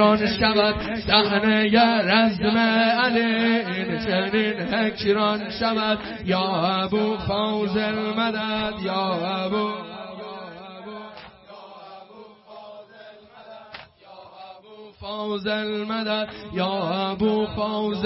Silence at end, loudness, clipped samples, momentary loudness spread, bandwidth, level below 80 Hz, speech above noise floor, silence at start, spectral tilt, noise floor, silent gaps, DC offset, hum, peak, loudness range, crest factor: 0 s; -22 LUFS; under 0.1%; 23 LU; 5.8 kHz; -50 dBFS; 24 dB; 0 s; -9 dB/octave; -46 dBFS; none; under 0.1%; none; -2 dBFS; 22 LU; 20 dB